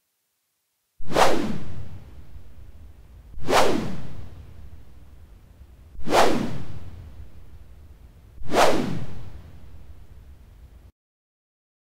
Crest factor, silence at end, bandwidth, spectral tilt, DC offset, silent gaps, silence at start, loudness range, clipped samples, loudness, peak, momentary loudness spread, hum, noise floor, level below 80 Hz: 20 dB; 1.25 s; 16 kHz; -4.5 dB/octave; under 0.1%; none; 1 s; 3 LU; under 0.1%; -23 LUFS; -4 dBFS; 27 LU; none; -74 dBFS; -44 dBFS